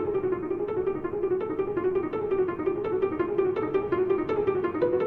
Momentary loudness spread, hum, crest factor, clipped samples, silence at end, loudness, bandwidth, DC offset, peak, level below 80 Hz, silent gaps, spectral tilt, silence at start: 3 LU; none; 14 dB; under 0.1%; 0 s; -28 LUFS; 4.3 kHz; under 0.1%; -12 dBFS; -54 dBFS; none; -9.5 dB/octave; 0 s